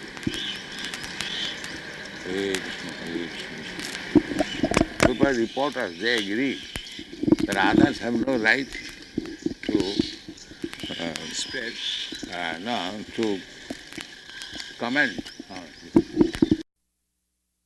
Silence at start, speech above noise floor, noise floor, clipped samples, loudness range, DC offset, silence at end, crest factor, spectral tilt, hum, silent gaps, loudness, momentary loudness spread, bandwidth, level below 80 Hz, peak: 0 s; 52 dB; -77 dBFS; under 0.1%; 7 LU; under 0.1%; 1.05 s; 24 dB; -4 dB/octave; none; none; -26 LUFS; 16 LU; 12 kHz; -48 dBFS; -4 dBFS